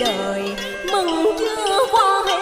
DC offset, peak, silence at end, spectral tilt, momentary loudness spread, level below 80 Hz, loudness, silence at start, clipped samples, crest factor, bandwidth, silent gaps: under 0.1%; -4 dBFS; 0 s; -2.5 dB/octave; 9 LU; -48 dBFS; -19 LUFS; 0 s; under 0.1%; 14 dB; 16 kHz; none